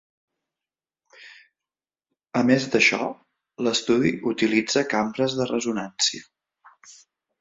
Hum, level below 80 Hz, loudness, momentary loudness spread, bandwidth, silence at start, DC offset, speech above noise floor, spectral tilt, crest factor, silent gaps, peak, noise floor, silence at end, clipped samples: none; -64 dBFS; -22 LUFS; 10 LU; 7.8 kHz; 1.2 s; under 0.1%; over 67 dB; -3.5 dB/octave; 20 dB; none; -4 dBFS; under -90 dBFS; 0.5 s; under 0.1%